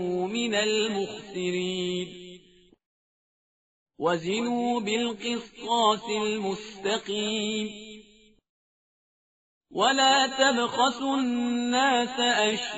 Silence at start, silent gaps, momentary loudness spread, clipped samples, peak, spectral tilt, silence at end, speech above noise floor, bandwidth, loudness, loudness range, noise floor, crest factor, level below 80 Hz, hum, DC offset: 0 s; 2.86-3.86 s, 8.49-9.61 s; 11 LU; under 0.1%; -8 dBFS; -1.5 dB/octave; 0 s; 31 dB; 8 kHz; -26 LUFS; 9 LU; -57 dBFS; 20 dB; -68 dBFS; none; under 0.1%